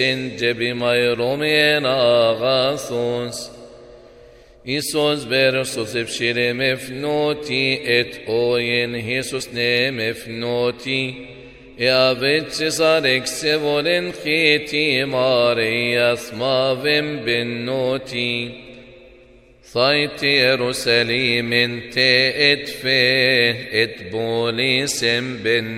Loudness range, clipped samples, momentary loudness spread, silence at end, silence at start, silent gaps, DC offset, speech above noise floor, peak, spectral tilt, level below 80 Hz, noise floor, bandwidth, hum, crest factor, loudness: 5 LU; under 0.1%; 8 LU; 0 s; 0 s; none; under 0.1%; 29 dB; 0 dBFS; -3.5 dB/octave; -54 dBFS; -48 dBFS; 16 kHz; none; 18 dB; -18 LUFS